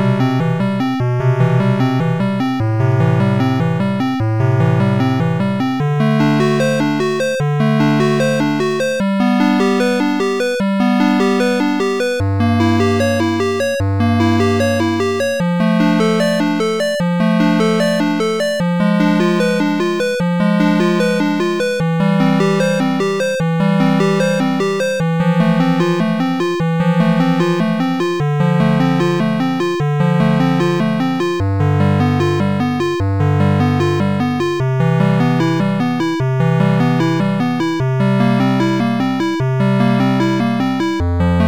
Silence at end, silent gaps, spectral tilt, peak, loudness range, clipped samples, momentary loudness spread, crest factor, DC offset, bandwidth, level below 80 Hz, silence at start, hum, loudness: 0 s; none; -7 dB/octave; -6 dBFS; 1 LU; under 0.1%; 3 LU; 8 dB; 0.9%; 17.5 kHz; -42 dBFS; 0 s; none; -15 LUFS